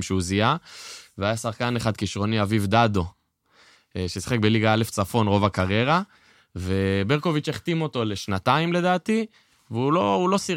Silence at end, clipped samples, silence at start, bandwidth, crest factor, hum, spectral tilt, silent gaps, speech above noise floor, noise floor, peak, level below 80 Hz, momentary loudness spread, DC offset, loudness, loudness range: 0 s; under 0.1%; 0 s; 16.5 kHz; 20 dB; none; -5.5 dB/octave; none; 37 dB; -60 dBFS; -4 dBFS; -52 dBFS; 12 LU; under 0.1%; -23 LUFS; 2 LU